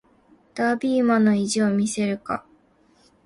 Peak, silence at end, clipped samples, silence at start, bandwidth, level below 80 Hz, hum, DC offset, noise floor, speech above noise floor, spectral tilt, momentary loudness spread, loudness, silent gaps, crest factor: -8 dBFS; 0.85 s; under 0.1%; 0.55 s; 11.5 kHz; -62 dBFS; none; under 0.1%; -59 dBFS; 38 dB; -5 dB/octave; 12 LU; -22 LUFS; none; 16 dB